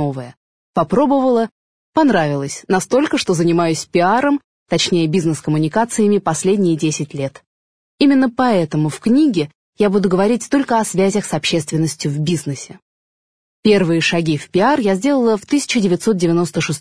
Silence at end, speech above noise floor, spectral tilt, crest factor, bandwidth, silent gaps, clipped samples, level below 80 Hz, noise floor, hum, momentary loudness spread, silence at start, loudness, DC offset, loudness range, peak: 0 s; over 74 dB; -5.5 dB/octave; 14 dB; 11 kHz; 0.37-0.74 s, 1.51-1.93 s, 4.44-4.66 s, 7.47-7.98 s, 9.55-9.73 s, 12.82-13.63 s; under 0.1%; -52 dBFS; under -90 dBFS; none; 8 LU; 0 s; -16 LUFS; 0.4%; 3 LU; -2 dBFS